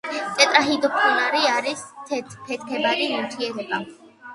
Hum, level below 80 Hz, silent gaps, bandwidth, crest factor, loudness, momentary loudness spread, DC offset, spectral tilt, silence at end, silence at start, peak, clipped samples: none; -70 dBFS; none; 11.5 kHz; 22 dB; -21 LUFS; 14 LU; under 0.1%; -2 dB/octave; 0 s; 0.05 s; 0 dBFS; under 0.1%